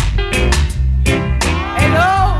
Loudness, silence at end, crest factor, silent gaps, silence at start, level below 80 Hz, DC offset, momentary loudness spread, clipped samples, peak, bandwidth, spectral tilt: -15 LUFS; 0 s; 12 dB; none; 0 s; -18 dBFS; under 0.1%; 4 LU; under 0.1%; 0 dBFS; 13.5 kHz; -5 dB/octave